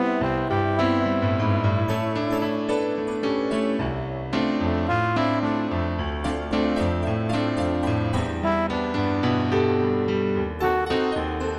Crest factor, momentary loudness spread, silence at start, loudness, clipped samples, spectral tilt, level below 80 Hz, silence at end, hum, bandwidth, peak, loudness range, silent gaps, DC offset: 14 dB; 4 LU; 0 s; -24 LUFS; under 0.1%; -7.5 dB/octave; -40 dBFS; 0 s; none; 14 kHz; -8 dBFS; 1 LU; none; under 0.1%